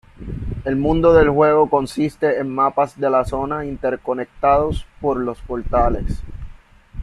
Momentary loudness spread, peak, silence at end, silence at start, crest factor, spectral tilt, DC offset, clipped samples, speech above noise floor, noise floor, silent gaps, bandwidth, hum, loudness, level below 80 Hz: 15 LU; -2 dBFS; 0 s; 0.2 s; 16 dB; -7.5 dB/octave; under 0.1%; under 0.1%; 23 dB; -41 dBFS; none; 12 kHz; none; -18 LUFS; -32 dBFS